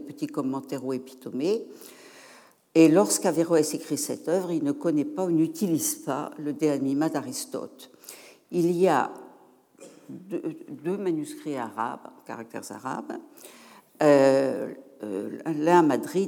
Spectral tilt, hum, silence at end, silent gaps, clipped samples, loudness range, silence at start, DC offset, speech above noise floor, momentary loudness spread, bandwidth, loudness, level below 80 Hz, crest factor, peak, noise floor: -5 dB/octave; none; 0 s; none; under 0.1%; 9 LU; 0 s; under 0.1%; 30 dB; 21 LU; 19.5 kHz; -26 LUFS; -86 dBFS; 20 dB; -6 dBFS; -56 dBFS